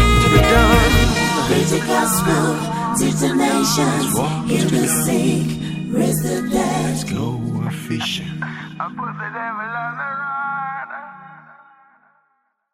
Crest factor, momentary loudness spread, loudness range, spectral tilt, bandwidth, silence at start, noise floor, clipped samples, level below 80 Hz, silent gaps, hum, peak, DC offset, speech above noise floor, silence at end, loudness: 18 dB; 14 LU; 10 LU; -4.5 dB/octave; 16 kHz; 0 s; -66 dBFS; under 0.1%; -28 dBFS; none; none; 0 dBFS; under 0.1%; 47 dB; 1.2 s; -18 LUFS